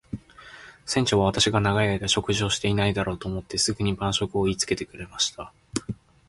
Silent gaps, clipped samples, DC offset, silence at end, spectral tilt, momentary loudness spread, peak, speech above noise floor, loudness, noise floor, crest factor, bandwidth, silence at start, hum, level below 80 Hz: none; under 0.1%; under 0.1%; 0.35 s; -4 dB/octave; 18 LU; -4 dBFS; 22 dB; -24 LUFS; -47 dBFS; 22 dB; 11.5 kHz; 0.15 s; none; -46 dBFS